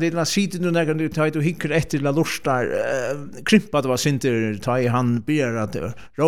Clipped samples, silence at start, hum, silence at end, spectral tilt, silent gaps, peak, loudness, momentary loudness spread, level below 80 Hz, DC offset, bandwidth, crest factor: under 0.1%; 0 s; none; 0 s; -5.5 dB/octave; none; -2 dBFS; -22 LUFS; 7 LU; -52 dBFS; 0.9%; 17 kHz; 18 dB